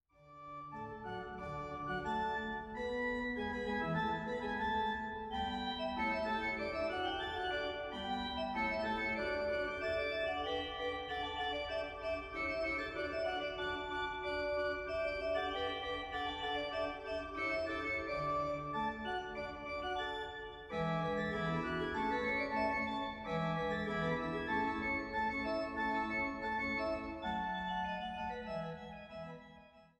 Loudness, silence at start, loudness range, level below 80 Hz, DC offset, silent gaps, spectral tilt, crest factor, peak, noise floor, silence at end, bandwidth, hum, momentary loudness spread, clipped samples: -38 LUFS; 0.2 s; 3 LU; -58 dBFS; under 0.1%; none; -6 dB/octave; 16 dB; -24 dBFS; -60 dBFS; 0.15 s; 11 kHz; none; 7 LU; under 0.1%